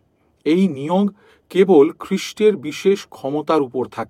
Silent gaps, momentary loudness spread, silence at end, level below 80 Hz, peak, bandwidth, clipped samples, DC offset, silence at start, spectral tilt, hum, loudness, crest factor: none; 11 LU; 0.05 s; -66 dBFS; -2 dBFS; 14.5 kHz; under 0.1%; under 0.1%; 0.45 s; -6.5 dB/octave; none; -18 LUFS; 16 dB